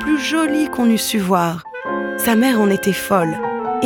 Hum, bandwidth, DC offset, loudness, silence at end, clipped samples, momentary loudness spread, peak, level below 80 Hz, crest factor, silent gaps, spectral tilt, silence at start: none; 17.5 kHz; under 0.1%; -17 LUFS; 0 s; under 0.1%; 8 LU; -2 dBFS; -50 dBFS; 16 dB; none; -4.5 dB/octave; 0 s